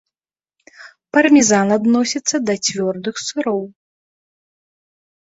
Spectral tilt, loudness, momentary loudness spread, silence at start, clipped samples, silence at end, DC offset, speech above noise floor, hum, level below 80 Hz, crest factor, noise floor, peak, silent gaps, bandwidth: -3.5 dB/octave; -16 LUFS; 12 LU; 0.8 s; under 0.1%; 1.5 s; under 0.1%; over 74 dB; none; -60 dBFS; 16 dB; under -90 dBFS; -2 dBFS; none; 8 kHz